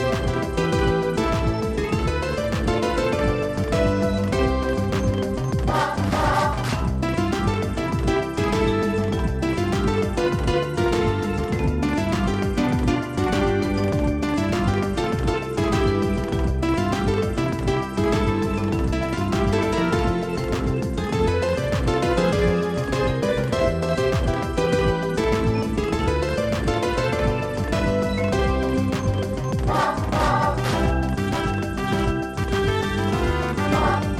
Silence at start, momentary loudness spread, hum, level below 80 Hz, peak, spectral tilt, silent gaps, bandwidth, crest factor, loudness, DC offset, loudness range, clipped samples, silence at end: 0 s; 3 LU; none; -30 dBFS; -6 dBFS; -6.5 dB/octave; none; 15.5 kHz; 16 dB; -22 LUFS; under 0.1%; 1 LU; under 0.1%; 0 s